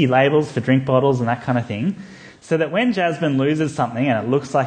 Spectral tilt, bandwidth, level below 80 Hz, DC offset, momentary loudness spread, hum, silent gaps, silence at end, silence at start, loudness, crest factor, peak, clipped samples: -7 dB/octave; 9.4 kHz; -58 dBFS; under 0.1%; 8 LU; none; none; 0 s; 0 s; -19 LUFS; 16 dB; -2 dBFS; under 0.1%